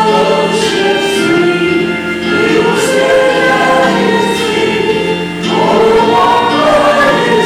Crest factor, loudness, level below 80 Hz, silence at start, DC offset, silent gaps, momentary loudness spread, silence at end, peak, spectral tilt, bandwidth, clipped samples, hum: 8 dB; -10 LUFS; -42 dBFS; 0 s; under 0.1%; none; 5 LU; 0 s; 0 dBFS; -4.5 dB/octave; 16 kHz; under 0.1%; none